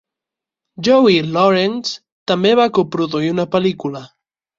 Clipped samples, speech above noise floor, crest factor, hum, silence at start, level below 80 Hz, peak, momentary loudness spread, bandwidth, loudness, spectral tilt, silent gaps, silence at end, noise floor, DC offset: under 0.1%; 71 dB; 16 dB; none; 0.8 s; -58 dBFS; -2 dBFS; 13 LU; 7.6 kHz; -16 LUFS; -6 dB/octave; 2.12-2.26 s; 0.55 s; -86 dBFS; under 0.1%